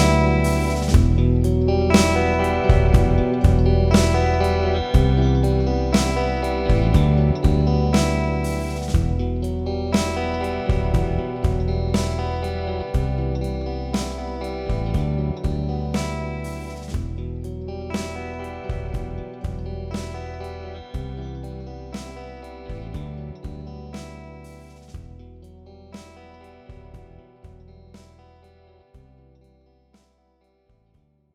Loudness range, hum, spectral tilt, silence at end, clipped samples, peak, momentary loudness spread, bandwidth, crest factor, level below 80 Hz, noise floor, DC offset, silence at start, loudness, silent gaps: 19 LU; none; -6.5 dB/octave; 3.35 s; under 0.1%; -2 dBFS; 19 LU; 14 kHz; 20 dB; -28 dBFS; -64 dBFS; under 0.1%; 0 s; -21 LUFS; none